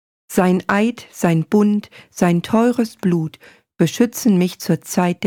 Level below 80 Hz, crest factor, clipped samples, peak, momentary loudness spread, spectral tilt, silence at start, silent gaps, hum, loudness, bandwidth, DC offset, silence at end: -58 dBFS; 14 dB; under 0.1%; -4 dBFS; 6 LU; -6 dB/octave; 0.3 s; none; none; -18 LUFS; 18.5 kHz; under 0.1%; 0 s